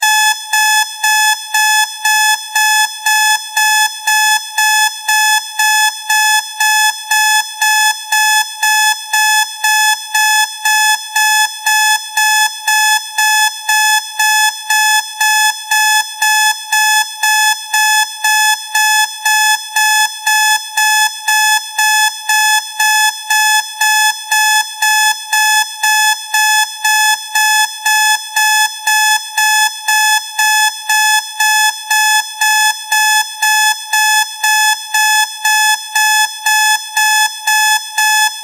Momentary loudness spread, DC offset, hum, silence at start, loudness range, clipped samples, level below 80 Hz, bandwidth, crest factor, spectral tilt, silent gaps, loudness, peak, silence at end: 2 LU; under 0.1%; none; 0 s; 0 LU; under 0.1%; -82 dBFS; 17.5 kHz; 12 dB; 8.5 dB/octave; none; -10 LUFS; 0 dBFS; 0 s